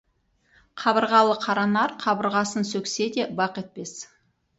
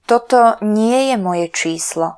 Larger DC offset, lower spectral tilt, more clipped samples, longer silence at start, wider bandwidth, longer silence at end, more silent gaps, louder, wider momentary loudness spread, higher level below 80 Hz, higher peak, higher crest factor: neither; about the same, -4 dB/octave vs -4 dB/octave; neither; first, 0.75 s vs 0.1 s; second, 8.2 kHz vs 11 kHz; first, 0.55 s vs 0 s; neither; second, -23 LUFS vs -15 LUFS; first, 17 LU vs 7 LU; second, -68 dBFS vs -62 dBFS; second, -6 dBFS vs 0 dBFS; first, 20 dB vs 14 dB